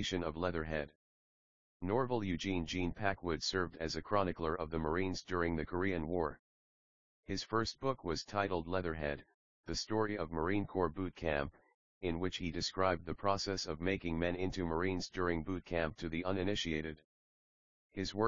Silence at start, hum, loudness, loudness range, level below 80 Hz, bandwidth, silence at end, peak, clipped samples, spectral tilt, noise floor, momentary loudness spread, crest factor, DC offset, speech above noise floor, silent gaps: 0 s; none; -38 LUFS; 2 LU; -56 dBFS; 7.4 kHz; 0 s; -16 dBFS; under 0.1%; -4 dB/octave; under -90 dBFS; 6 LU; 22 dB; 0.2%; over 53 dB; 0.95-1.80 s, 6.39-7.23 s, 9.34-9.64 s, 11.74-12.01 s, 17.04-17.90 s